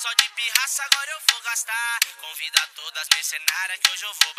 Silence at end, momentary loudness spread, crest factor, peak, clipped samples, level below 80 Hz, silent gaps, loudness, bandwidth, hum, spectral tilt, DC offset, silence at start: 0.05 s; 5 LU; 24 dB; 0 dBFS; under 0.1%; -72 dBFS; none; -21 LUFS; 16 kHz; none; 5 dB/octave; under 0.1%; 0 s